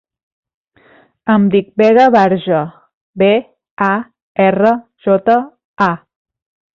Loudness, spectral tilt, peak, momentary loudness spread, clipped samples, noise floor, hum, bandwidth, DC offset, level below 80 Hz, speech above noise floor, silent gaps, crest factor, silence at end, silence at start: -13 LUFS; -8 dB/octave; -2 dBFS; 12 LU; under 0.1%; -49 dBFS; none; 7 kHz; under 0.1%; -56 dBFS; 37 dB; 2.94-3.13 s, 3.71-3.77 s, 4.22-4.35 s, 5.65-5.74 s; 14 dB; 0.8 s; 1.25 s